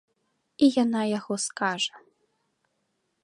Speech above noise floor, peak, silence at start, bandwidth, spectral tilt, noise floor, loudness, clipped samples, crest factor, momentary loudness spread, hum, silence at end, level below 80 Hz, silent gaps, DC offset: 51 dB; -8 dBFS; 0.6 s; 11.5 kHz; -3.5 dB/octave; -76 dBFS; -26 LUFS; under 0.1%; 20 dB; 8 LU; none; 1.25 s; -76 dBFS; none; under 0.1%